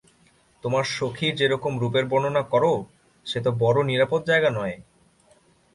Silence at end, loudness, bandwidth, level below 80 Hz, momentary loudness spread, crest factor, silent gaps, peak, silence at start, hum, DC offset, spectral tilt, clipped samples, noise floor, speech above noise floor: 0.95 s; -23 LUFS; 11.5 kHz; -60 dBFS; 10 LU; 18 dB; none; -6 dBFS; 0.65 s; none; under 0.1%; -5.5 dB/octave; under 0.1%; -60 dBFS; 37 dB